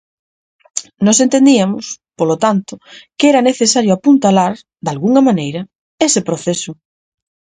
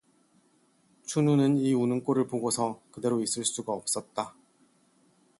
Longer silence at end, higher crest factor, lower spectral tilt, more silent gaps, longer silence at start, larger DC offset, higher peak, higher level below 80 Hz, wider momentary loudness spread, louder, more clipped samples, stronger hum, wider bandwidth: second, 0.85 s vs 1.1 s; about the same, 14 dB vs 16 dB; about the same, -4.5 dB/octave vs -5 dB/octave; first, 5.75-5.98 s vs none; second, 0.75 s vs 1.05 s; neither; first, 0 dBFS vs -14 dBFS; first, -58 dBFS vs -72 dBFS; first, 14 LU vs 11 LU; first, -13 LUFS vs -28 LUFS; neither; neither; second, 9.6 kHz vs 12 kHz